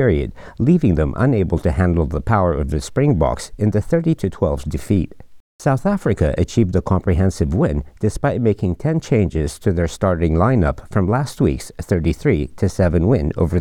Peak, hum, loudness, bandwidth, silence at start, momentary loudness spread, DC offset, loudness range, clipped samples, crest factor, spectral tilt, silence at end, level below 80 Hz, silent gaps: -2 dBFS; none; -18 LUFS; 13.5 kHz; 0 s; 5 LU; under 0.1%; 2 LU; under 0.1%; 16 dB; -8 dB/octave; 0 s; -32 dBFS; 5.40-5.59 s